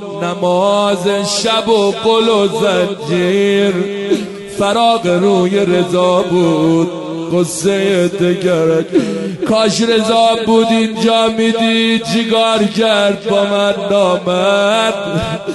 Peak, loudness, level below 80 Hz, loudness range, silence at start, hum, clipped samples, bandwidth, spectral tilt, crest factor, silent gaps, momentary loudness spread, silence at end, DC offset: -2 dBFS; -13 LUFS; -48 dBFS; 2 LU; 0 s; none; under 0.1%; 12 kHz; -5 dB/octave; 12 dB; none; 6 LU; 0 s; under 0.1%